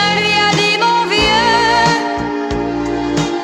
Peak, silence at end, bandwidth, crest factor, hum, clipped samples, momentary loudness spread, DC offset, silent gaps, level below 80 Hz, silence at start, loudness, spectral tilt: 0 dBFS; 0 s; 13.5 kHz; 14 dB; none; under 0.1%; 8 LU; under 0.1%; none; -36 dBFS; 0 s; -13 LUFS; -3.5 dB/octave